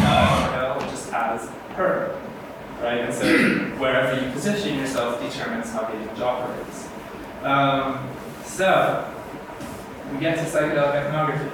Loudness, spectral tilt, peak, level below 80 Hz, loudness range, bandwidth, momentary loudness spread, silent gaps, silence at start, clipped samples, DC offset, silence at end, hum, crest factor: -23 LUFS; -5 dB/octave; -4 dBFS; -48 dBFS; 3 LU; 19.5 kHz; 16 LU; none; 0 s; under 0.1%; under 0.1%; 0 s; none; 18 dB